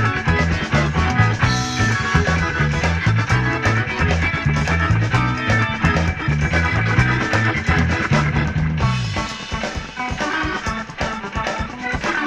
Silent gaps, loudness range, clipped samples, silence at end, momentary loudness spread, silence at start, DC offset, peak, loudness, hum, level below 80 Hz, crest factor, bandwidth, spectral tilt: none; 4 LU; under 0.1%; 0 s; 7 LU; 0 s; under 0.1%; -2 dBFS; -19 LUFS; none; -30 dBFS; 16 dB; 10 kHz; -5.5 dB/octave